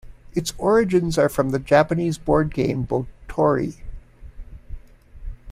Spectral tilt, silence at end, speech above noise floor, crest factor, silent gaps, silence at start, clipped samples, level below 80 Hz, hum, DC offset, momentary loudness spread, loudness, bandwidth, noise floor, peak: -6.5 dB/octave; 0 s; 21 dB; 18 dB; none; 0.05 s; under 0.1%; -38 dBFS; none; under 0.1%; 13 LU; -21 LUFS; 16 kHz; -40 dBFS; -4 dBFS